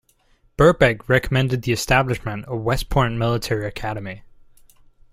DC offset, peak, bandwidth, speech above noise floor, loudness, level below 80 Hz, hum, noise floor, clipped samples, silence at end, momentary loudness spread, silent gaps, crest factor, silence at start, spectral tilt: under 0.1%; -2 dBFS; 16 kHz; 39 dB; -20 LUFS; -36 dBFS; none; -59 dBFS; under 0.1%; 0.95 s; 12 LU; none; 20 dB; 0.6 s; -5.5 dB/octave